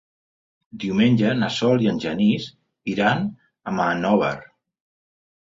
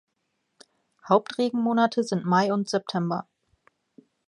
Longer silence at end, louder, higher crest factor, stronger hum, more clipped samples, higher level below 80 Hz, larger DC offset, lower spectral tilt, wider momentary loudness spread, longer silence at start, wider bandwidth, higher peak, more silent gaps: about the same, 1 s vs 1.05 s; first, -21 LUFS vs -25 LUFS; about the same, 18 dB vs 20 dB; neither; neither; first, -58 dBFS vs -76 dBFS; neither; about the same, -6.5 dB/octave vs -6 dB/octave; first, 13 LU vs 6 LU; second, 0.75 s vs 1.05 s; second, 7.8 kHz vs 11 kHz; about the same, -6 dBFS vs -6 dBFS; neither